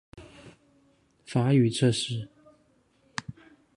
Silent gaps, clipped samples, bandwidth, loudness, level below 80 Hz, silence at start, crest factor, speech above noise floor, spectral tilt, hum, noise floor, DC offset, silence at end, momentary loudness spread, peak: none; under 0.1%; 11.5 kHz; -27 LUFS; -62 dBFS; 0.15 s; 20 dB; 42 dB; -6 dB/octave; none; -66 dBFS; under 0.1%; 0.45 s; 24 LU; -10 dBFS